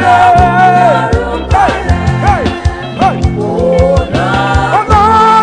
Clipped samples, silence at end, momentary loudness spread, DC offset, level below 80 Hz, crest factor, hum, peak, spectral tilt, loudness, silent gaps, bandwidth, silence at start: 1%; 0 s; 7 LU; under 0.1%; -20 dBFS; 8 dB; none; 0 dBFS; -6.5 dB/octave; -9 LUFS; none; 10 kHz; 0 s